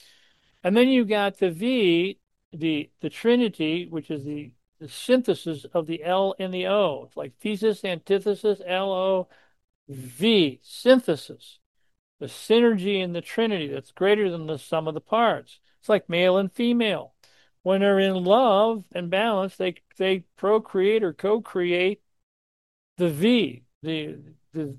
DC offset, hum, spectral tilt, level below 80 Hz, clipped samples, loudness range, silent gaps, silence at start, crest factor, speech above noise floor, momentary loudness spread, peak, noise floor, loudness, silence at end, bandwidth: under 0.1%; none; -6 dB/octave; -72 dBFS; under 0.1%; 4 LU; 2.45-2.51 s, 9.75-9.87 s, 11.66-11.75 s, 11.99-12.19 s, 17.60-17.64 s, 22.23-22.96 s, 23.75-23.81 s; 0.65 s; 20 dB; 39 dB; 13 LU; -6 dBFS; -62 dBFS; -24 LUFS; 0 s; 12.5 kHz